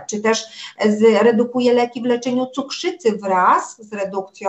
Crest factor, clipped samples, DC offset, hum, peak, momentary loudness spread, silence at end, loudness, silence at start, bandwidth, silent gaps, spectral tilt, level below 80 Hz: 14 dB; under 0.1%; under 0.1%; none; -4 dBFS; 11 LU; 0 s; -18 LUFS; 0 s; 8.4 kHz; none; -4.5 dB/octave; -68 dBFS